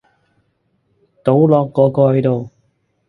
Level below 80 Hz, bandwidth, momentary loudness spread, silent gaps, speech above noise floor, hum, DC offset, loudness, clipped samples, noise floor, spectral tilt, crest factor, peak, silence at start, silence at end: -56 dBFS; 4.6 kHz; 10 LU; none; 51 dB; none; under 0.1%; -14 LUFS; under 0.1%; -64 dBFS; -11 dB/octave; 16 dB; 0 dBFS; 1.25 s; 0.6 s